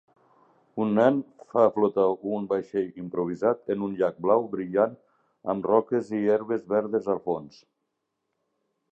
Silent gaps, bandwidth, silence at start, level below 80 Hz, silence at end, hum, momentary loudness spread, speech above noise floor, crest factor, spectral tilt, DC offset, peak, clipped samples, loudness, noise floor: none; 8 kHz; 0.75 s; -70 dBFS; 1.45 s; none; 9 LU; 55 dB; 20 dB; -8.5 dB/octave; under 0.1%; -6 dBFS; under 0.1%; -26 LUFS; -80 dBFS